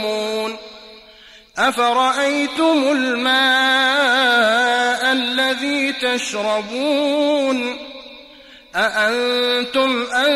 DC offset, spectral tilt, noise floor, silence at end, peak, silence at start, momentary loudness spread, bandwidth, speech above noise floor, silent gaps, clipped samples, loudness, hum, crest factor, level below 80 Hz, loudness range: under 0.1%; -2 dB/octave; -45 dBFS; 0 s; -6 dBFS; 0 s; 10 LU; 15 kHz; 28 dB; none; under 0.1%; -17 LUFS; none; 14 dB; -60 dBFS; 5 LU